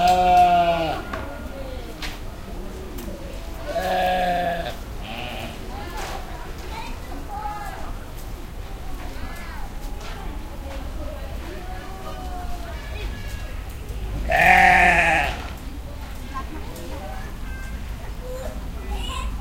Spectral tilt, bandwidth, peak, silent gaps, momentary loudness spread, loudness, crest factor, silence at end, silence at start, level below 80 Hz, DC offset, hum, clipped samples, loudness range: -4.5 dB/octave; 17 kHz; 0 dBFS; none; 20 LU; -23 LUFS; 24 dB; 0 s; 0 s; -32 dBFS; under 0.1%; none; under 0.1%; 16 LU